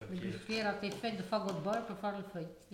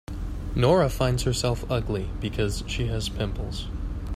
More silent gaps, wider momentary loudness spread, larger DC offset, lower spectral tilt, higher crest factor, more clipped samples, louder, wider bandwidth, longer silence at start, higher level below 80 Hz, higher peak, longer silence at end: neither; second, 7 LU vs 12 LU; neither; about the same, -5.5 dB/octave vs -5.5 dB/octave; about the same, 16 dB vs 18 dB; neither; second, -38 LUFS vs -27 LUFS; about the same, 16.5 kHz vs 15 kHz; about the same, 0 s vs 0.1 s; second, -68 dBFS vs -34 dBFS; second, -24 dBFS vs -8 dBFS; about the same, 0 s vs 0 s